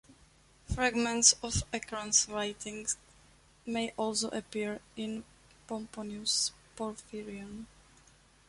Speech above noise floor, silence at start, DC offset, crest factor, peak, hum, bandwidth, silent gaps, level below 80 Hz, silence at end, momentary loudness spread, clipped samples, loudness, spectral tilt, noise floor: 29 dB; 0.1 s; under 0.1%; 28 dB; -8 dBFS; none; 11.5 kHz; none; -54 dBFS; 0.8 s; 19 LU; under 0.1%; -32 LUFS; -2 dB/octave; -62 dBFS